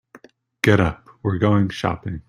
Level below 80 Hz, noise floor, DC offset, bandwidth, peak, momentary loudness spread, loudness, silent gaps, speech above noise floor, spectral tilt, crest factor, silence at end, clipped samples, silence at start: -44 dBFS; -49 dBFS; under 0.1%; 15 kHz; 0 dBFS; 8 LU; -20 LUFS; none; 30 dB; -7 dB/octave; 20 dB; 0.1 s; under 0.1%; 0.15 s